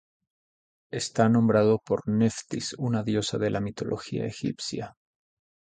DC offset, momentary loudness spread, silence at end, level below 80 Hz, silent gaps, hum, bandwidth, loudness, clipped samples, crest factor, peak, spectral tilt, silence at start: under 0.1%; 12 LU; 0.85 s; -58 dBFS; none; none; 9.4 kHz; -27 LUFS; under 0.1%; 20 dB; -6 dBFS; -6 dB/octave; 0.95 s